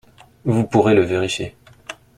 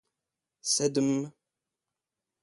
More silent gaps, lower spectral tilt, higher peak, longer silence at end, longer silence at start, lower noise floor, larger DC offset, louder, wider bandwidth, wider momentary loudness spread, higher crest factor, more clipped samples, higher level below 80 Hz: neither; first, -6 dB/octave vs -3.5 dB/octave; first, -2 dBFS vs -12 dBFS; second, 0.25 s vs 1.1 s; second, 0.45 s vs 0.65 s; second, -39 dBFS vs -89 dBFS; neither; first, -18 LUFS vs -28 LUFS; first, 13 kHz vs 11.5 kHz; first, 21 LU vs 12 LU; about the same, 18 dB vs 20 dB; neither; first, -50 dBFS vs -74 dBFS